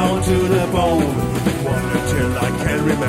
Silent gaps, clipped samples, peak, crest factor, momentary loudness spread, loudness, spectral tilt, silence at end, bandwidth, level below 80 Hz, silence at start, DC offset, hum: none; under 0.1%; -4 dBFS; 14 dB; 3 LU; -18 LUFS; -6 dB/octave; 0 s; 16 kHz; -32 dBFS; 0 s; under 0.1%; none